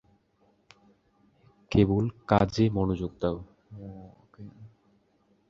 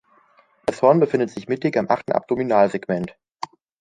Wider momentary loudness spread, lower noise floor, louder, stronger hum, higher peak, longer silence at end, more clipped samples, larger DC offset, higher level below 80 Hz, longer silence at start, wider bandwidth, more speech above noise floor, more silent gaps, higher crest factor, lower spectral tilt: first, 25 LU vs 19 LU; first, -68 dBFS vs -57 dBFS; second, -27 LUFS vs -21 LUFS; neither; second, -6 dBFS vs -2 dBFS; first, 0.85 s vs 0.7 s; neither; neither; first, -48 dBFS vs -60 dBFS; first, 1.7 s vs 0.65 s; second, 7.6 kHz vs 11 kHz; about the same, 41 dB vs 38 dB; neither; about the same, 24 dB vs 20 dB; about the same, -8 dB/octave vs -7.5 dB/octave